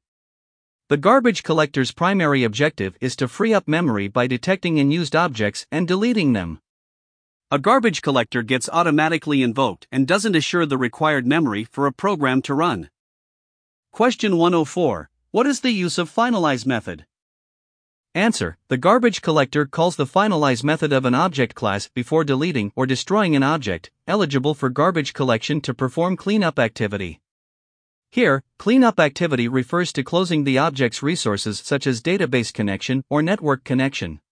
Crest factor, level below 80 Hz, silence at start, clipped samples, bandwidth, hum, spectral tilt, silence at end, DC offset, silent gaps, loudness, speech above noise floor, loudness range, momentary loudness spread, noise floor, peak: 18 dB; -56 dBFS; 0.9 s; under 0.1%; 10.5 kHz; none; -5.5 dB/octave; 0.15 s; under 0.1%; 6.69-7.40 s, 12.99-13.83 s, 17.22-18.04 s, 27.31-28.02 s; -20 LUFS; over 71 dB; 3 LU; 7 LU; under -90 dBFS; -2 dBFS